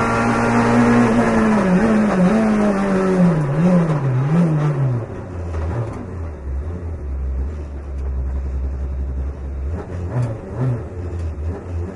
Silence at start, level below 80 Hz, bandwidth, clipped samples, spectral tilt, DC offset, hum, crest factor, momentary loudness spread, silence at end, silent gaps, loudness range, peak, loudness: 0 s; -30 dBFS; 11.5 kHz; under 0.1%; -8 dB/octave; under 0.1%; none; 16 dB; 13 LU; 0 s; none; 11 LU; -2 dBFS; -19 LUFS